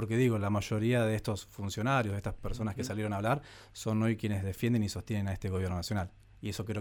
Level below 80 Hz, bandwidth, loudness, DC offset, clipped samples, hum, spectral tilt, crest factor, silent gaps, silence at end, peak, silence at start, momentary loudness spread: -50 dBFS; 18.5 kHz; -33 LUFS; under 0.1%; under 0.1%; none; -6.5 dB/octave; 16 dB; none; 0 s; -16 dBFS; 0 s; 10 LU